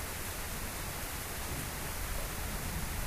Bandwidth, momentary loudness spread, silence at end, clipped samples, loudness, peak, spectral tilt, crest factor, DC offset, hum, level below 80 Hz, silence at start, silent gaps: 15.5 kHz; 1 LU; 0 s; under 0.1%; -38 LUFS; -24 dBFS; -3 dB/octave; 14 dB; under 0.1%; none; -42 dBFS; 0 s; none